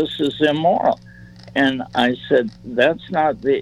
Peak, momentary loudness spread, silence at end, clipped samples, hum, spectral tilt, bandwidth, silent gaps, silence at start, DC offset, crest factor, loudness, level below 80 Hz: -2 dBFS; 4 LU; 0 s; under 0.1%; none; -6 dB/octave; 11.5 kHz; none; 0 s; under 0.1%; 16 dB; -19 LUFS; -52 dBFS